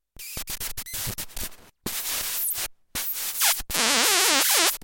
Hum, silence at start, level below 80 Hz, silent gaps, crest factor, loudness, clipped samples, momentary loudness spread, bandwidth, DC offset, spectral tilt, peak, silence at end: none; 0.2 s; -46 dBFS; none; 24 dB; -23 LUFS; under 0.1%; 16 LU; 17 kHz; under 0.1%; 0 dB/octave; -2 dBFS; 0 s